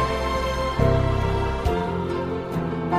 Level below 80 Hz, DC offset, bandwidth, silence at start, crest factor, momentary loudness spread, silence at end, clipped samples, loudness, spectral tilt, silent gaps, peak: -30 dBFS; 0.1%; 14.5 kHz; 0 s; 16 dB; 6 LU; 0 s; under 0.1%; -24 LUFS; -7 dB/octave; none; -8 dBFS